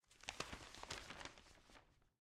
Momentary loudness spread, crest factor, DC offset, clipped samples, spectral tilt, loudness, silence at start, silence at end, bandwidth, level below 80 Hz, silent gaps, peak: 16 LU; 30 dB; under 0.1%; under 0.1%; -2 dB/octave; -52 LUFS; 0.05 s; 0.15 s; 16 kHz; -68 dBFS; none; -26 dBFS